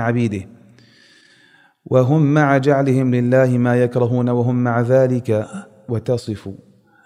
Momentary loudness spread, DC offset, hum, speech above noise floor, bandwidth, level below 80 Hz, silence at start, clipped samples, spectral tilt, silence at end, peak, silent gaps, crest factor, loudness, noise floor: 14 LU; under 0.1%; none; 37 dB; 10.5 kHz; -60 dBFS; 0 s; under 0.1%; -8.5 dB/octave; 0.5 s; -2 dBFS; none; 16 dB; -17 LUFS; -53 dBFS